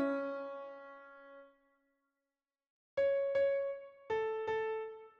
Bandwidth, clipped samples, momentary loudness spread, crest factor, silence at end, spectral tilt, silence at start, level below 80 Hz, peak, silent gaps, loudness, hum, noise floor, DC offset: 6.2 kHz; under 0.1%; 21 LU; 14 dB; 0.1 s; -6 dB/octave; 0 s; -78 dBFS; -24 dBFS; 2.70-2.97 s; -37 LUFS; none; under -90 dBFS; under 0.1%